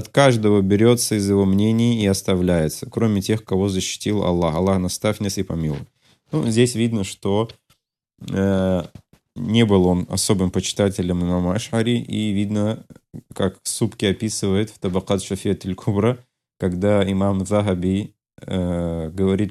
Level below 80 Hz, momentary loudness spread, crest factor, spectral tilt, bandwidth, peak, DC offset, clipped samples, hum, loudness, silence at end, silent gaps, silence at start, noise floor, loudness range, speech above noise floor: -50 dBFS; 9 LU; 18 dB; -5.5 dB/octave; 14 kHz; -2 dBFS; under 0.1%; under 0.1%; none; -20 LUFS; 0 s; none; 0 s; -64 dBFS; 4 LU; 45 dB